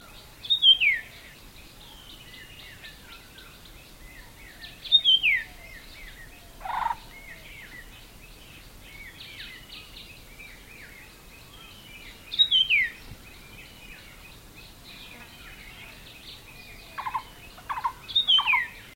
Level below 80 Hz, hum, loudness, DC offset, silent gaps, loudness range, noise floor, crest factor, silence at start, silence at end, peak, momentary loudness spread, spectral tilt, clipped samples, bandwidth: -52 dBFS; none; -22 LUFS; under 0.1%; none; 19 LU; -48 dBFS; 22 dB; 0.15 s; 0.15 s; -8 dBFS; 28 LU; -0.5 dB/octave; under 0.1%; 16.5 kHz